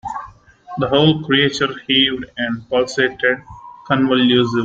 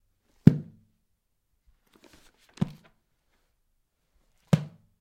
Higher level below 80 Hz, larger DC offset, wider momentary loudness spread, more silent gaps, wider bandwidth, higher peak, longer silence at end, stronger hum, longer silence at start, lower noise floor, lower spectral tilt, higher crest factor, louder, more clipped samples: first, -50 dBFS vs -58 dBFS; neither; second, 10 LU vs 14 LU; neither; second, 8 kHz vs 13 kHz; about the same, 0 dBFS vs 0 dBFS; second, 0 s vs 0.35 s; neither; second, 0.05 s vs 0.45 s; second, -40 dBFS vs -76 dBFS; second, -5 dB/octave vs -8.5 dB/octave; second, 16 dB vs 30 dB; first, -16 LUFS vs -26 LUFS; neither